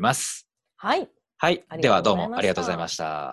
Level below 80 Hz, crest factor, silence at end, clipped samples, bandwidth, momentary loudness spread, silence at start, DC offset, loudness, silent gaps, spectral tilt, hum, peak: -56 dBFS; 20 dB; 0 s; under 0.1%; 13 kHz; 10 LU; 0 s; under 0.1%; -24 LUFS; none; -4 dB/octave; none; -4 dBFS